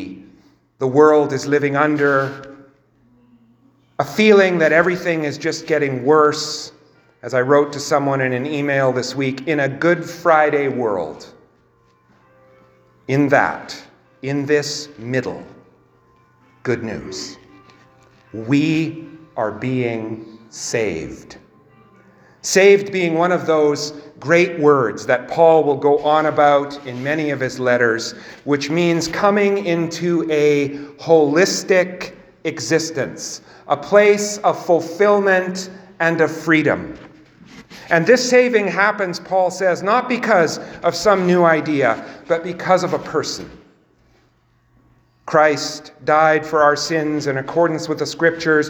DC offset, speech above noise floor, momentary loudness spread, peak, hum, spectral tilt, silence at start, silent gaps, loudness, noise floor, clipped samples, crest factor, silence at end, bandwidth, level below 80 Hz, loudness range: under 0.1%; 41 dB; 15 LU; 0 dBFS; none; -5 dB/octave; 0 s; none; -17 LUFS; -58 dBFS; under 0.1%; 18 dB; 0 s; 20 kHz; -58 dBFS; 7 LU